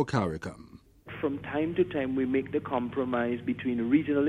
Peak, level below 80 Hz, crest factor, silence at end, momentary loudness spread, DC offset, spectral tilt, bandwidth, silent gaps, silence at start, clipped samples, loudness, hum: -12 dBFS; -58 dBFS; 18 dB; 0 s; 10 LU; under 0.1%; -7.5 dB/octave; 10 kHz; none; 0 s; under 0.1%; -30 LUFS; none